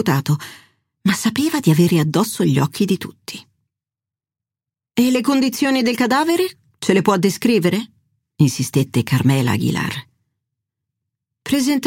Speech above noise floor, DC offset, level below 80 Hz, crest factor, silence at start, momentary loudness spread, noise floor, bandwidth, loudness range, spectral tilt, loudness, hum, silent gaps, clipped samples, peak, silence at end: 72 dB; under 0.1%; -58 dBFS; 16 dB; 0 s; 10 LU; -89 dBFS; 17 kHz; 4 LU; -5.5 dB/octave; -18 LUFS; none; none; under 0.1%; -2 dBFS; 0 s